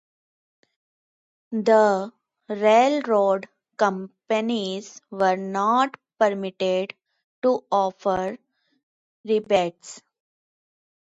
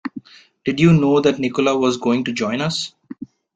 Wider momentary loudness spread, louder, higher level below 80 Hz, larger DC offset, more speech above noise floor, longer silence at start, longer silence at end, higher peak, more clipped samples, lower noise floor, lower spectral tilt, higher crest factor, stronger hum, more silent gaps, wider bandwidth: second, 17 LU vs 22 LU; second, -23 LUFS vs -18 LUFS; second, -68 dBFS vs -52 dBFS; neither; first, over 68 dB vs 21 dB; first, 1.5 s vs 0.05 s; first, 1.15 s vs 0.3 s; second, -6 dBFS vs -2 dBFS; neither; first, under -90 dBFS vs -38 dBFS; about the same, -5 dB/octave vs -6 dB/octave; about the same, 20 dB vs 16 dB; neither; first, 7.24-7.42 s, 8.83-9.24 s vs none; second, 8 kHz vs 9 kHz